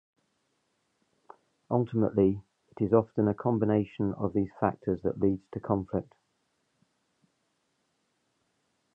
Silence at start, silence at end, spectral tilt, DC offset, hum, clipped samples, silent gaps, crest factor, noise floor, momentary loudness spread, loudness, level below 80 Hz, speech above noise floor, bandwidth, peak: 1.7 s; 2.9 s; -11 dB/octave; under 0.1%; none; under 0.1%; none; 22 dB; -76 dBFS; 8 LU; -29 LUFS; -58 dBFS; 48 dB; 3.7 kHz; -8 dBFS